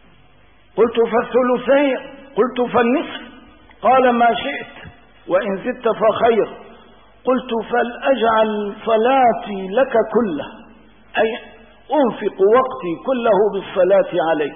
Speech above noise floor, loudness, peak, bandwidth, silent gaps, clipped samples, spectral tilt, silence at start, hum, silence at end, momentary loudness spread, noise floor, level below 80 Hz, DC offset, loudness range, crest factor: 35 dB; -17 LUFS; -4 dBFS; 3.7 kHz; none; under 0.1%; -10.5 dB/octave; 0.75 s; none; 0 s; 11 LU; -52 dBFS; -54 dBFS; 0.3%; 2 LU; 14 dB